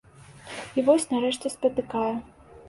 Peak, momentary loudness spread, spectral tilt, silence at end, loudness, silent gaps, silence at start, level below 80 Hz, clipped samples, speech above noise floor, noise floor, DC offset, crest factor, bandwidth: -8 dBFS; 14 LU; -4 dB/octave; 0 s; -26 LUFS; none; 0.3 s; -60 dBFS; under 0.1%; 22 dB; -47 dBFS; under 0.1%; 20 dB; 11.5 kHz